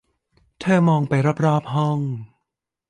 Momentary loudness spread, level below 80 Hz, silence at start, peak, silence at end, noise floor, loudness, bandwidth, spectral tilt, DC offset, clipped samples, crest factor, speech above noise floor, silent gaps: 11 LU; -60 dBFS; 0.6 s; -6 dBFS; 0.65 s; -81 dBFS; -20 LUFS; 9.8 kHz; -8 dB/octave; under 0.1%; under 0.1%; 14 dB; 62 dB; none